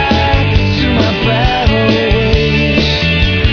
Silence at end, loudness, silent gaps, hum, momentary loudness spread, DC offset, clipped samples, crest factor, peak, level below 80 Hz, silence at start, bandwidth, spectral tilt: 0 s; -11 LUFS; none; none; 1 LU; under 0.1%; under 0.1%; 10 dB; 0 dBFS; -18 dBFS; 0 s; 5.4 kHz; -6.5 dB/octave